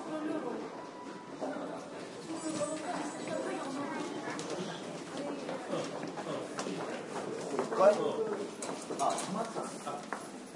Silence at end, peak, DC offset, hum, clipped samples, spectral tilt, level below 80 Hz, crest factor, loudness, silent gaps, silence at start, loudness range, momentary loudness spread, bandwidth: 0 s; -12 dBFS; under 0.1%; none; under 0.1%; -4 dB/octave; -84 dBFS; 24 dB; -37 LUFS; none; 0 s; 6 LU; 9 LU; 11.5 kHz